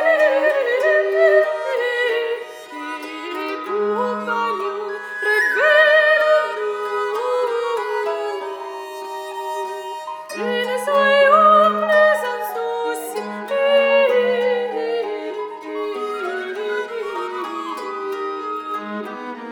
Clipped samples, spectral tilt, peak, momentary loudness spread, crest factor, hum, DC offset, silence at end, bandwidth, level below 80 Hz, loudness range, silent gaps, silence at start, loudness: under 0.1%; -3 dB/octave; -2 dBFS; 15 LU; 18 dB; none; under 0.1%; 0 s; 19.5 kHz; -78 dBFS; 9 LU; none; 0 s; -19 LUFS